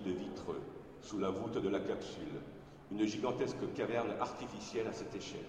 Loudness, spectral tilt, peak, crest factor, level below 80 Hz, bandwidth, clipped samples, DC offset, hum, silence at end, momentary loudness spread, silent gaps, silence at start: -40 LUFS; -5.5 dB/octave; -20 dBFS; 18 dB; -66 dBFS; 10.5 kHz; under 0.1%; under 0.1%; none; 0 s; 10 LU; none; 0 s